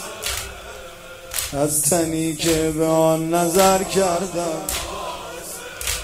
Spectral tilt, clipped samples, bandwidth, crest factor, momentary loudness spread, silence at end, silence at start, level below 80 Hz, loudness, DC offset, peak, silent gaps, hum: -3.5 dB/octave; under 0.1%; 16 kHz; 22 dB; 16 LU; 0 s; 0 s; -42 dBFS; -20 LUFS; under 0.1%; 0 dBFS; none; none